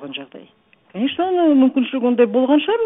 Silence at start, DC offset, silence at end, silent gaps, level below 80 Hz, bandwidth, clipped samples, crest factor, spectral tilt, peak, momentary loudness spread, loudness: 0 s; under 0.1%; 0 s; none; -66 dBFS; 3.9 kHz; under 0.1%; 14 dB; -10 dB/octave; -2 dBFS; 17 LU; -17 LUFS